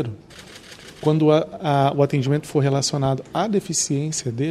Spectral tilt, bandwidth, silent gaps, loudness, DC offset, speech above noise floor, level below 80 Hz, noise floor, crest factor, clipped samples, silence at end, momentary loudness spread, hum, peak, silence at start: -5.5 dB/octave; 12.5 kHz; none; -21 LUFS; under 0.1%; 21 dB; -56 dBFS; -42 dBFS; 18 dB; under 0.1%; 0 s; 21 LU; none; -4 dBFS; 0 s